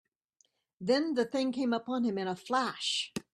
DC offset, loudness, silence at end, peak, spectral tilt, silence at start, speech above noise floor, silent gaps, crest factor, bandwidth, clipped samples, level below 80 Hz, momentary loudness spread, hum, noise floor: under 0.1%; -32 LUFS; 0.15 s; -16 dBFS; -4 dB/octave; 0.8 s; 42 dB; none; 18 dB; 12.5 kHz; under 0.1%; -76 dBFS; 4 LU; none; -73 dBFS